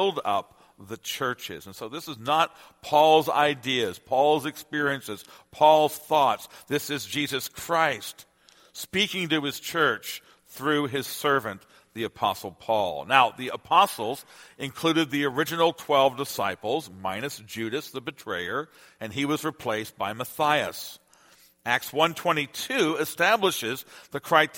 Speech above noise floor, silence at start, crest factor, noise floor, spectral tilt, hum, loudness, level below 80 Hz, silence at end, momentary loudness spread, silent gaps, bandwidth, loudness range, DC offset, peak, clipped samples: 32 dB; 0 s; 24 dB; -58 dBFS; -3.5 dB/octave; none; -25 LUFS; -68 dBFS; 0 s; 16 LU; none; 17 kHz; 5 LU; under 0.1%; -2 dBFS; under 0.1%